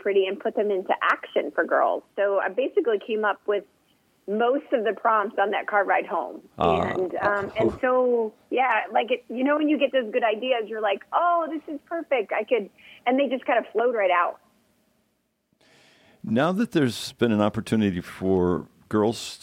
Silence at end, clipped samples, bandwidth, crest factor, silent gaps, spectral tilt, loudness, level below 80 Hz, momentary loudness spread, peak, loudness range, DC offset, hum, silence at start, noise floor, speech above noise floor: 0.05 s; under 0.1%; 16 kHz; 18 dB; none; -6 dB/octave; -24 LUFS; -60 dBFS; 6 LU; -6 dBFS; 3 LU; under 0.1%; none; 0.05 s; -72 dBFS; 48 dB